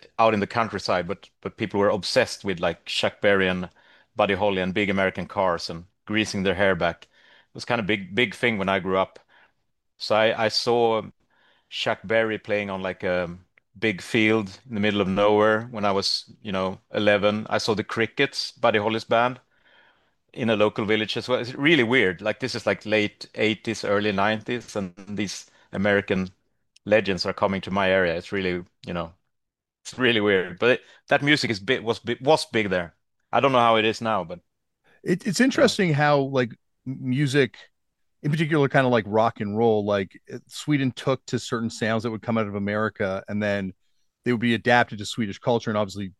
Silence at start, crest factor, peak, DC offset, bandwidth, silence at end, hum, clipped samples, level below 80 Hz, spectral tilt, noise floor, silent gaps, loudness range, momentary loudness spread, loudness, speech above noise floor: 0.2 s; 22 dB; -2 dBFS; under 0.1%; 12.5 kHz; 0.1 s; none; under 0.1%; -60 dBFS; -5 dB/octave; -82 dBFS; none; 3 LU; 12 LU; -23 LUFS; 59 dB